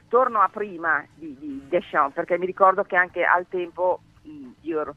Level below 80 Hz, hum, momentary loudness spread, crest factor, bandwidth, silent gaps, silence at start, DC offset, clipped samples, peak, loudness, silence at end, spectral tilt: -64 dBFS; none; 18 LU; 22 dB; 6 kHz; none; 0.1 s; under 0.1%; under 0.1%; -2 dBFS; -23 LUFS; 0.05 s; -7 dB/octave